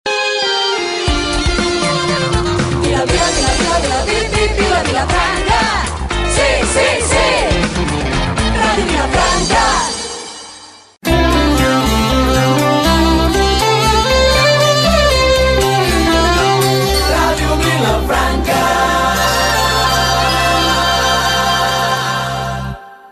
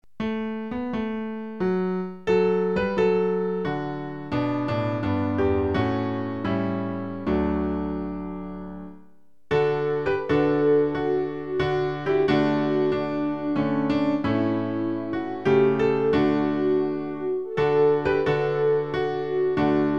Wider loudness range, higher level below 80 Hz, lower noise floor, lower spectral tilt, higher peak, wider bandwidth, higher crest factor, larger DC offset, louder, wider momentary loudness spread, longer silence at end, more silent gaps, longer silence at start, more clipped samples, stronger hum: about the same, 3 LU vs 4 LU; first, -22 dBFS vs -48 dBFS; second, -37 dBFS vs -58 dBFS; second, -4 dB/octave vs -8.5 dB/octave; first, 0 dBFS vs -8 dBFS; first, 14.5 kHz vs 7 kHz; about the same, 12 dB vs 16 dB; second, under 0.1% vs 0.5%; first, -13 LUFS vs -24 LUFS; second, 5 LU vs 9 LU; about the same, 0.05 s vs 0 s; neither; second, 0.05 s vs 0.2 s; neither; neither